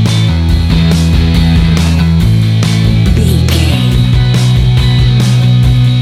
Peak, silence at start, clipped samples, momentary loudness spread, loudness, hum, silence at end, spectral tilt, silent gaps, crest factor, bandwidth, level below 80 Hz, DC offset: 0 dBFS; 0 s; under 0.1%; 2 LU; -9 LUFS; none; 0 s; -6.5 dB/octave; none; 8 dB; 14 kHz; -16 dBFS; under 0.1%